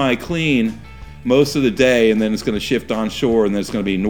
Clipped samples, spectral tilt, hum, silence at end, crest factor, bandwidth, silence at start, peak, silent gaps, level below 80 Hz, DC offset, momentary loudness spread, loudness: under 0.1%; -5.5 dB/octave; none; 0 s; 16 dB; 19.5 kHz; 0 s; 0 dBFS; none; -42 dBFS; 0.7%; 7 LU; -17 LUFS